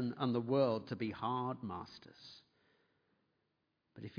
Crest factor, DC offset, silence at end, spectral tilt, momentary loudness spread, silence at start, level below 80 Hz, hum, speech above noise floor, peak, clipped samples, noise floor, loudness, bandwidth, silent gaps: 20 dB; under 0.1%; 0 s; -6 dB/octave; 21 LU; 0 s; -78 dBFS; none; 45 dB; -20 dBFS; under 0.1%; -83 dBFS; -38 LUFS; 5.2 kHz; none